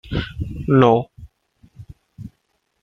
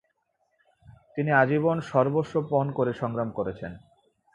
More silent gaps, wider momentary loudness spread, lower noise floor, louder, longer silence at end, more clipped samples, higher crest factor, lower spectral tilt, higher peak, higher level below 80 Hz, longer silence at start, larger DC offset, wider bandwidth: neither; first, 26 LU vs 12 LU; second, -69 dBFS vs -74 dBFS; first, -18 LUFS vs -26 LUFS; about the same, 0.55 s vs 0.55 s; neither; about the same, 20 dB vs 22 dB; about the same, -8.5 dB/octave vs -8.5 dB/octave; first, 0 dBFS vs -6 dBFS; first, -40 dBFS vs -60 dBFS; second, 0.05 s vs 0.9 s; neither; second, 6.8 kHz vs 7.8 kHz